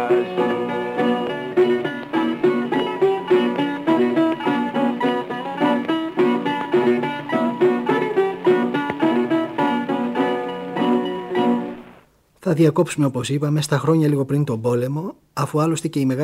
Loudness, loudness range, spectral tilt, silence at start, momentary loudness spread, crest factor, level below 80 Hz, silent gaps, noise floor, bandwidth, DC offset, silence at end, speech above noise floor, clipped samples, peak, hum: -20 LUFS; 2 LU; -6.5 dB/octave; 0 s; 6 LU; 16 dB; -62 dBFS; none; -52 dBFS; 15.5 kHz; under 0.1%; 0 s; 33 dB; under 0.1%; -4 dBFS; none